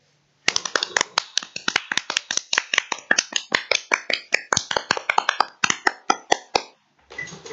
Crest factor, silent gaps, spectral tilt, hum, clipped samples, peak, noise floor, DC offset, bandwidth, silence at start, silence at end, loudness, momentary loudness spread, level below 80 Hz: 24 dB; none; 0 dB/octave; none; under 0.1%; 0 dBFS; -49 dBFS; under 0.1%; 12 kHz; 0.45 s; 0 s; -22 LUFS; 5 LU; -62 dBFS